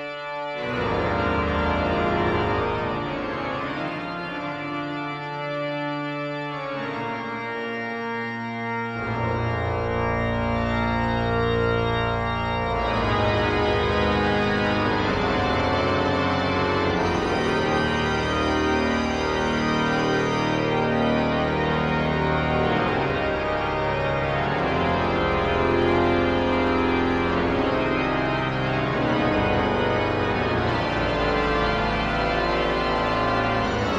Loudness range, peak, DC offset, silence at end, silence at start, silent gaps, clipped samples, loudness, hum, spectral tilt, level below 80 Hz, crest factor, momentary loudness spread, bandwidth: 7 LU; -8 dBFS; under 0.1%; 0 s; 0 s; none; under 0.1%; -23 LUFS; none; -6.5 dB/octave; -38 dBFS; 14 dB; 7 LU; 9.8 kHz